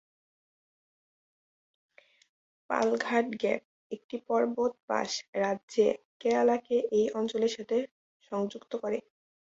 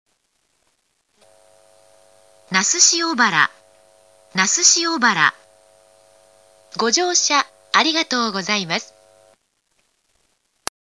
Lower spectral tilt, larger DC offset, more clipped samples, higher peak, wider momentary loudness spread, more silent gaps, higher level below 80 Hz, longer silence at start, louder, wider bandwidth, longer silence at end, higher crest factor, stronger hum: first, -4.5 dB/octave vs -0.5 dB/octave; neither; neither; second, -12 dBFS vs 0 dBFS; about the same, 10 LU vs 11 LU; first, 3.65-3.90 s, 4.04-4.09 s, 4.83-4.88 s, 5.28-5.33 s, 5.63-5.68 s, 6.05-6.20 s, 7.91-8.20 s vs none; about the same, -74 dBFS vs -72 dBFS; first, 2.7 s vs 2.5 s; second, -30 LUFS vs -16 LUFS; second, 7.8 kHz vs 11 kHz; second, 0.45 s vs 2 s; about the same, 20 dB vs 22 dB; neither